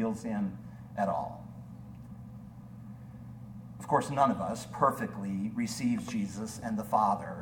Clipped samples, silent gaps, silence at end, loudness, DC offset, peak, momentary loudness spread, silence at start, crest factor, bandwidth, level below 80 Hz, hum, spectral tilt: under 0.1%; none; 0 s; -32 LUFS; under 0.1%; -12 dBFS; 19 LU; 0 s; 22 dB; 18 kHz; -60 dBFS; none; -6 dB/octave